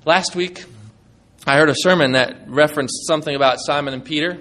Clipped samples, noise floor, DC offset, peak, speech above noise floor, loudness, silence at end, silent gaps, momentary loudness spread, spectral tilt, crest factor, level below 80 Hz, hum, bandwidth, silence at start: under 0.1%; -51 dBFS; under 0.1%; 0 dBFS; 34 dB; -17 LUFS; 0 s; none; 10 LU; -4 dB/octave; 18 dB; -56 dBFS; none; 13 kHz; 0.05 s